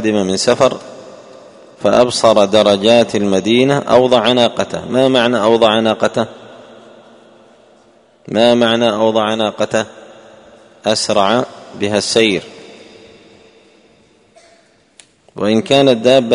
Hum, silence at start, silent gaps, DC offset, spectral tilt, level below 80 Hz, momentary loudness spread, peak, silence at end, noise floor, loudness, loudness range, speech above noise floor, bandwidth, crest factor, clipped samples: none; 0 s; none; under 0.1%; -4.5 dB/octave; -54 dBFS; 10 LU; 0 dBFS; 0 s; -51 dBFS; -13 LUFS; 8 LU; 38 dB; 11 kHz; 14 dB; 0.1%